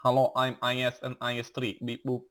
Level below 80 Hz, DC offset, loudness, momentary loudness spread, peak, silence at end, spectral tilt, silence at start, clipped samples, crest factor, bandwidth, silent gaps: -72 dBFS; under 0.1%; -30 LUFS; 9 LU; -12 dBFS; 0.05 s; -5.5 dB/octave; 0 s; under 0.1%; 16 dB; 19 kHz; none